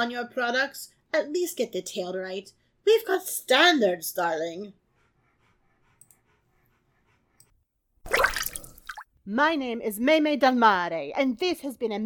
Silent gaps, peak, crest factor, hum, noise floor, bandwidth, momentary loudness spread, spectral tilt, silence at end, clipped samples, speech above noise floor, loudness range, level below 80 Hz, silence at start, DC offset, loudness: none; -6 dBFS; 22 dB; none; -70 dBFS; 19 kHz; 18 LU; -2.5 dB/octave; 0 s; under 0.1%; 45 dB; 8 LU; -56 dBFS; 0 s; under 0.1%; -25 LUFS